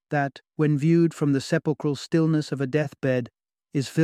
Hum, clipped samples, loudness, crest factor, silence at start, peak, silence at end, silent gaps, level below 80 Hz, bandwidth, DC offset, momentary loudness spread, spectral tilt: none; under 0.1%; -24 LUFS; 16 dB; 0.1 s; -8 dBFS; 0 s; none; -66 dBFS; 12.5 kHz; under 0.1%; 8 LU; -7 dB/octave